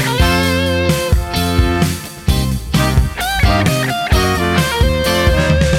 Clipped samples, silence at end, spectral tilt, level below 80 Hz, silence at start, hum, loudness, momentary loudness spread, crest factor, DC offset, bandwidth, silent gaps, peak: under 0.1%; 0 s; -5 dB/octave; -20 dBFS; 0 s; none; -15 LUFS; 4 LU; 14 dB; under 0.1%; 17 kHz; none; 0 dBFS